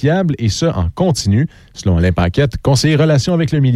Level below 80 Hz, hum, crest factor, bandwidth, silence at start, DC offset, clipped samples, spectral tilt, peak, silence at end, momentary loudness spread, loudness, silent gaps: -30 dBFS; none; 12 dB; 13 kHz; 0 s; under 0.1%; under 0.1%; -6 dB/octave; -2 dBFS; 0 s; 5 LU; -15 LUFS; none